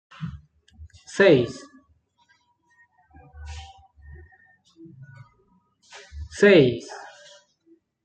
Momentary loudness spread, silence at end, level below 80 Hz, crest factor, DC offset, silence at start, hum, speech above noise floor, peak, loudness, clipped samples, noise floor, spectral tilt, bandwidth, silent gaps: 27 LU; 1.05 s; -52 dBFS; 22 dB; under 0.1%; 0.2 s; none; 47 dB; -4 dBFS; -19 LUFS; under 0.1%; -65 dBFS; -6 dB/octave; 9 kHz; none